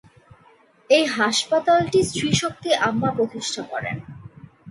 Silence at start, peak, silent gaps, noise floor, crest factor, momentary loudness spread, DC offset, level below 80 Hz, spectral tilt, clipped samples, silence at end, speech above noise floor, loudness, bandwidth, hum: 0.9 s; -4 dBFS; none; -55 dBFS; 18 dB; 12 LU; under 0.1%; -54 dBFS; -4 dB/octave; under 0.1%; 0 s; 34 dB; -21 LUFS; 11.5 kHz; none